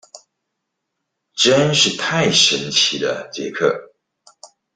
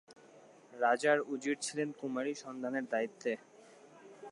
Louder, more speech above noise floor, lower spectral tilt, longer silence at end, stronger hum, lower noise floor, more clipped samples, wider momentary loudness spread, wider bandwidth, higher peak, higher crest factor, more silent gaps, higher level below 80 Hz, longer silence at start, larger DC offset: first, -16 LUFS vs -35 LUFS; first, 60 dB vs 25 dB; about the same, -2.5 dB/octave vs -3.5 dB/octave; first, 0.3 s vs 0 s; neither; first, -77 dBFS vs -59 dBFS; neither; about the same, 13 LU vs 11 LU; second, 10 kHz vs 11.5 kHz; first, 0 dBFS vs -16 dBFS; about the same, 20 dB vs 20 dB; neither; first, -58 dBFS vs under -90 dBFS; about the same, 0.15 s vs 0.1 s; neither